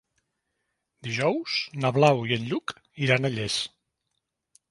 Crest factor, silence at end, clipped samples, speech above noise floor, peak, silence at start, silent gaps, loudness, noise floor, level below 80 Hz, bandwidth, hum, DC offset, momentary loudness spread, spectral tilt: 22 dB; 1.05 s; under 0.1%; 55 dB; -6 dBFS; 1.05 s; none; -25 LUFS; -80 dBFS; -64 dBFS; 11.5 kHz; none; under 0.1%; 12 LU; -5 dB/octave